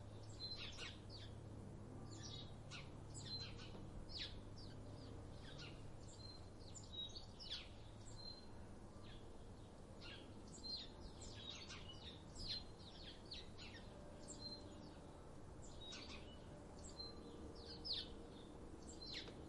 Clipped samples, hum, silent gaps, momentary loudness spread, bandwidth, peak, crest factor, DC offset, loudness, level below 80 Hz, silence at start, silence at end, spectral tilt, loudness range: under 0.1%; none; none; 9 LU; 11 kHz; -34 dBFS; 20 dB; under 0.1%; -54 LUFS; -62 dBFS; 0 s; 0 s; -4 dB/octave; 3 LU